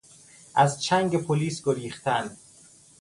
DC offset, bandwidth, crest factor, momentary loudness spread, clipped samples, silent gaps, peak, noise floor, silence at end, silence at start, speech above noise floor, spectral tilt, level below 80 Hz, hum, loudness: under 0.1%; 11.5 kHz; 20 dB; 6 LU; under 0.1%; none; -6 dBFS; -54 dBFS; 0.65 s; 0.55 s; 29 dB; -5 dB/octave; -64 dBFS; none; -25 LUFS